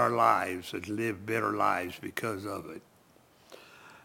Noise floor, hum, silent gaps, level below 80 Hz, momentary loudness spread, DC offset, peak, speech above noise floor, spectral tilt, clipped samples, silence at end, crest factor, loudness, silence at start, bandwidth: -62 dBFS; none; none; -70 dBFS; 24 LU; under 0.1%; -10 dBFS; 31 dB; -5 dB/octave; under 0.1%; 0.05 s; 22 dB; -31 LUFS; 0 s; 17 kHz